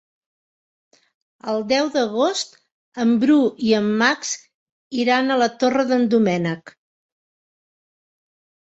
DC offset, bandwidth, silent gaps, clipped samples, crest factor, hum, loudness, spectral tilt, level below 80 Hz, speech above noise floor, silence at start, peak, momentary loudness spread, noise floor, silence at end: under 0.1%; 8.2 kHz; 2.72-2.92 s, 4.54-4.66 s, 4.72-4.91 s; under 0.1%; 18 dB; none; -19 LUFS; -4.5 dB/octave; -66 dBFS; over 71 dB; 1.45 s; -2 dBFS; 12 LU; under -90 dBFS; 2.05 s